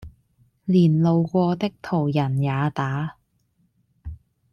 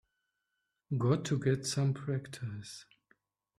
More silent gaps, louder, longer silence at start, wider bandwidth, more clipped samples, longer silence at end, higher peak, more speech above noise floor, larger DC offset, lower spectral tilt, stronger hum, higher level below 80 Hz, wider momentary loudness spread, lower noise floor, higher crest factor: neither; first, -22 LUFS vs -34 LUFS; second, 0 s vs 0.9 s; second, 6.8 kHz vs 13 kHz; neither; second, 0.4 s vs 0.75 s; first, -8 dBFS vs -16 dBFS; second, 46 dB vs 52 dB; neither; first, -9 dB/octave vs -6 dB/octave; neither; first, -52 dBFS vs -68 dBFS; first, 22 LU vs 14 LU; second, -67 dBFS vs -85 dBFS; about the same, 14 dB vs 18 dB